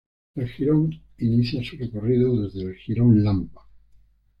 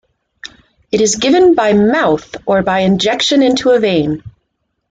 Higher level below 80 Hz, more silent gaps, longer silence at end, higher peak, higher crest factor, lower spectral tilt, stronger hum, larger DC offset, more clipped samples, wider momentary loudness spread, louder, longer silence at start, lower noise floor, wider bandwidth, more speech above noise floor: about the same, -48 dBFS vs -46 dBFS; neither; first, 0.8 s vs 0.6 s; second, -8 dBFS vs -2 dBFS; about the same, 16 dB vs 12 dB; first, -10 dB/octave vs -4.5 dB/octave; neither; neither; neither; about the same, 14 LU vs 16 LU; second, -23 LUFS vs -12 LUFS; about the same, 0.35 s vs 0.45 s; second, -56 dBFS vs -68 dBFS; second, 5.6 kHz vs 9.4 kHz; second, 34 dB vs 57 dB